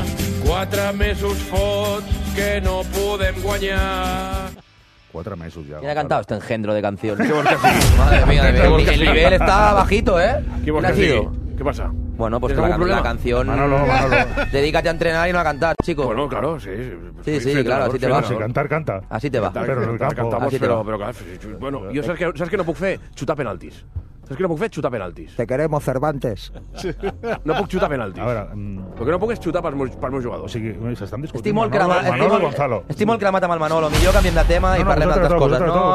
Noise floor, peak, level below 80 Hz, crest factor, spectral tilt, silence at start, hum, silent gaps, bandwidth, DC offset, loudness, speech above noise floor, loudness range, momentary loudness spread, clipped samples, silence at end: -51 dBFS; 0 dBFS; -26 dBFS; 18 dB; -6 dB/octave; 0 s; none; none; 14 kHz; under 0.1%; -19 LUFS; 32 dB; 9 LU; 14 LU; under 0.1%; 0 s